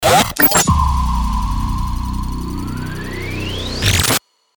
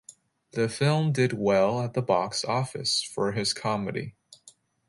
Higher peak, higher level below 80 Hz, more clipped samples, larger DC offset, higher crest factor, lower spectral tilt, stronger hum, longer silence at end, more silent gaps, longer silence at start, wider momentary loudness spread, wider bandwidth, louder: first, -2 dBFS vs -8 dBFS; first, -22 dBFS vs -64 dBFS; neither; neither; about the same, 16 dB vs 18 dB; second, -3.5 dB/octave vs -5 dB/octave; first, 60 Hz at -45 dBFS vs none; about the same, 0.4 s vs 0.4 s; neither; about the same, 0 s vs 0.1 s; first, 14 LU vs 7 LU; first, over 20 kHz vs 11.5 kHz; first, -17 LUFS vs -26 LUFS